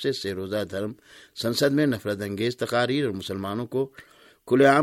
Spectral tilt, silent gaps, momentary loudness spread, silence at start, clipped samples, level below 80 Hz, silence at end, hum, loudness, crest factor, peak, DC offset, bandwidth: -5.5 dB/octave; none; 11 LU; 0 s; under 0.1%; -64 dBFS; 0 s; none; -26 LUFS; 20 dB; -6 dBFS; under 0.1%; 16.5 kHz